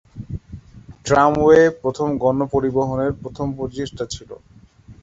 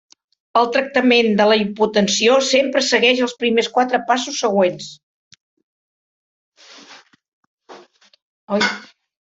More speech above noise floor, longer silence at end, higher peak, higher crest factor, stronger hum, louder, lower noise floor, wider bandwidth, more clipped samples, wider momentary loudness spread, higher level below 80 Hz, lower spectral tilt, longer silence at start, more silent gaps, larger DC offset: about the same, 27 dB vs 29 dB; second, 0.1 s vs 0.35 s; about the same, -2 dBFS vs -2 dBFS; about the same, 18 dB vs 18 dB; neither; second, -19 LUFS vs -16 LUFS; about the same, -45 dBFS vs -46 dBFS; about the same, 8 kHz vs 8 kHz; neither; first, 20 LU vs 7 LU; first, -42 dBFS vs -64 dBFS; first, -6.5 dB/octave vs -3 dB/octave; second, 0.15 s vs 0.55 s; second, none vs 5.03-5.31 s, 5.41-5.57 s, 5.63-6.52 s, 7.28-7.58 s, 8.22-8.47 s; neither